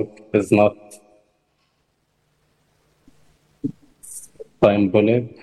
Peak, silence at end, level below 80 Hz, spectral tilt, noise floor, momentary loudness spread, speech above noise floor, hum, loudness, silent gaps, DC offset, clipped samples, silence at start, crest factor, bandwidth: -2 dBFS; 0.15 s; -54 dBFS; -7 dB/octave; -68 dBFS; 21 LU; 50 dB; none; -19 LUFS; none; under 0.1%; under 0.1%; 0 s; 20 dB; 12.5 kHz